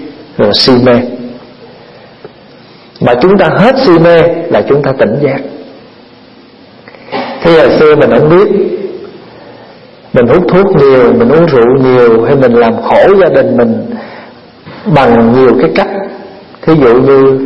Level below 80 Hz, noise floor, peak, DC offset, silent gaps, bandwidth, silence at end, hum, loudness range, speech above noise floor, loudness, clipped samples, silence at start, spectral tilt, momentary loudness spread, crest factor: -38 dBFS; -36 dBFS; 0 dBFS; under 0.1%; none; 8.2 kHz; 0 s; none; 5 LU; 30 dB; -6 LUFS; 1%; 0 s; -8 dB/octave; 15 LU; 8 dB